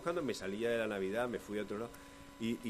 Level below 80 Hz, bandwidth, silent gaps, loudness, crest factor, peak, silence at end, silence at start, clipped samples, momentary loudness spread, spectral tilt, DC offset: -64 dBFS; 14.5 kHz; none; -39 LUFS; 16 dB; -22 dBFS; 0 s; 0 s; under 0.1%; 11 LU; -5 dB/octave; under 0.1%